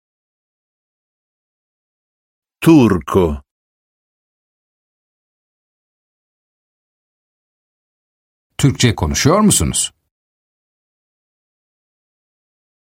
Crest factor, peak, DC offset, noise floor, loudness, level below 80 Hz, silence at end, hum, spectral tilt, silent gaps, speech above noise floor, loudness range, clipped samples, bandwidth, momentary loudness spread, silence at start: 20 dB; 0 dBFS; under 0.1%; under -90 dBFS; -14 LUFS; -40 dBFS; 2.95 s; none; -5 dB/octave; 3.51-8.50 s; over 77 dB; 7 LU; under 0.1%; 16 kHz; 10 LU; 2.6 s